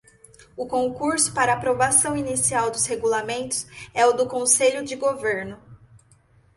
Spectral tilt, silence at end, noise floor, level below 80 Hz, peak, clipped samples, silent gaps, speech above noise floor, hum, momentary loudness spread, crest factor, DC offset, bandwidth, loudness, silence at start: -2.5 dB/octave; 0.8 s; -57 dBFS; -56 dBFS; -4 dBFS; under 0.1%; none; 35 dB; none; 10 LU; 20 dB; under 0.1%; 12 kHz; -21 LUFS; 0.55 s